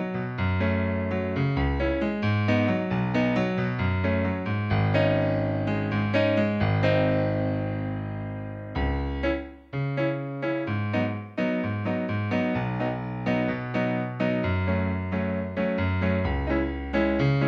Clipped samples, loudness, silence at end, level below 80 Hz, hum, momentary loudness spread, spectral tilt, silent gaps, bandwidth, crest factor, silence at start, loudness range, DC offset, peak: under 0.1%; -26 LUFS; 0 s; -40 dBFS; none; 7 LU; -9 dB/octave; none; 6.6 kHz; 16 dB; 0 s; 4 LU; under 0.1%; -10 dBFS